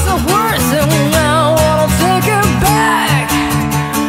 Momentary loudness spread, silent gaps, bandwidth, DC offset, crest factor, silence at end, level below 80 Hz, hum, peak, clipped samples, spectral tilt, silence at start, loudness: 3 LU; none; 16.5 kHz; under 0.1%; 12 dB; 0 s; -26 dBFS; none; 0 dBFS; under 0.1%; -4.5 dB/octave; 0 s; -12 LUFS